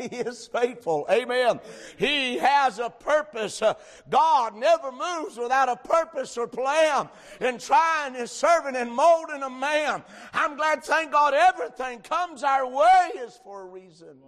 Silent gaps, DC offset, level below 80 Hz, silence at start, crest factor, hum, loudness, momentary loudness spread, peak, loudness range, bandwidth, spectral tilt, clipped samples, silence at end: none; under 0.1%; -64 dBFS; 0 s; 14 dB; none; -24 LUFS; 12 LU; -10 dBFS; 2 LU; 13 kHz; -2.5 dB/octave; under 0.1%; 0.15 s